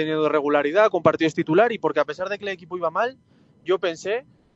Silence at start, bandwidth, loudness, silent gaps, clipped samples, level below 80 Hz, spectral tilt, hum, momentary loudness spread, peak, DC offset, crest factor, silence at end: 0 s; 8 kHz; -22 LUFS; none; under 0.1%; -68 dBFS; -6 dB/octave; none; 10 LU; -4 dBFS; under 0.1%; 20 dB; 0.35 s